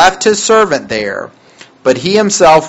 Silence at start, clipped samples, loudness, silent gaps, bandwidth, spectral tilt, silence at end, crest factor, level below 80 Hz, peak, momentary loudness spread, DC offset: 0 s; 1%; -11 LUFS; none; 9.8 kHz; -3 dB/octave; 0 s; 10 dB; -44 dBFS; 0 dBFS; 12 LU; under 0.1%